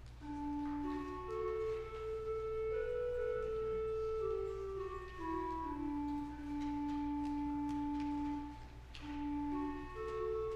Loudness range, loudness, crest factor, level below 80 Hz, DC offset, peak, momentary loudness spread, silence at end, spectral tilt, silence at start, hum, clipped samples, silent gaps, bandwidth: 1 LU; -41 LUFS; 10 dB; -52 dBFS; under 0.1%; -30 dBFS; 6 LU; 0 s; -7.5 dB/octave; 0 s; none; under 0.1%; none; 9 kHz